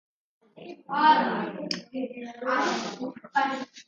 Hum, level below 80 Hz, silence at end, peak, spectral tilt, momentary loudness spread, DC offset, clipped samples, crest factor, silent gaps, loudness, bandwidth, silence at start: none; -80 dBFS; 0.05 s; -8 dBFS; -4 dB/octave; 16 LU; under 0.1%; under 0.1%; 20 dB; none; -27 LUFS; 7.8 kHz; 0.55 s